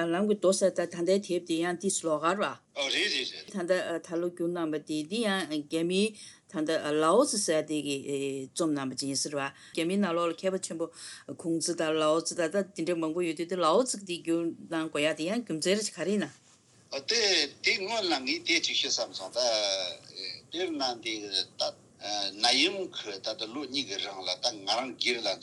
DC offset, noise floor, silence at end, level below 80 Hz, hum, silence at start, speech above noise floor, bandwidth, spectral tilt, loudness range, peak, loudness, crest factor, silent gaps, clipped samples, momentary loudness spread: under 0.1%; -60 dBFS; 0 s; -84 dBFS; none; 0 s; 30 dB; 12 kHz; -3 dB/octave; 3 LU; -8 dBFS; -29 LUFS; 22 dB; none; under 0.1%; 10 LU